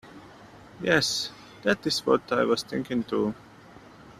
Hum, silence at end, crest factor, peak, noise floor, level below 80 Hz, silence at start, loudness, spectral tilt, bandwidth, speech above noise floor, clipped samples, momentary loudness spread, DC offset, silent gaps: none; 0.1 s; 24 dB; -4 dBFS; -50 dBFS; -60 dBFS; 0.05 s; -26 LUFS; -3.5 dB/octave; 14.5 kHz; 24 dB; under 0.1%; 8 LU; under 0.1%; none